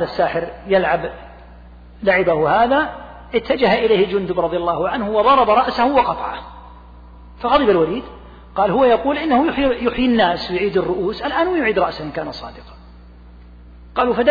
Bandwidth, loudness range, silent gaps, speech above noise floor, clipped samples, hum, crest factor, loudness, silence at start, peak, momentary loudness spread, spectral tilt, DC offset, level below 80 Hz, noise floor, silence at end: 5 kHz; 4 LU; none; 24 dB; under 0.1%; none; 14 dB; -17 LUFS; 0 s; -4 dBFS; 13 LU; -7.5 dB/octave; under 0.1%; -40 dBFS; -41 dBFS; 0 s